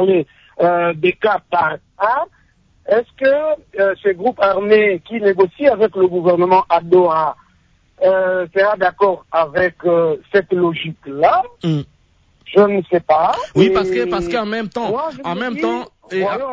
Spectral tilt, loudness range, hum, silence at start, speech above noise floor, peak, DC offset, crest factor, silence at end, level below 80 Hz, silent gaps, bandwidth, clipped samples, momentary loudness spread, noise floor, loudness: -7 dB/octave; 3 LU; none; 0 s; 40 dB; -2 dBFS; under 0.1%; 14 dB; 0 s; -50 dBFS; none; 7.6 kHz; under 0.1%; 8 LU; -55 dBFS; -16 LUFS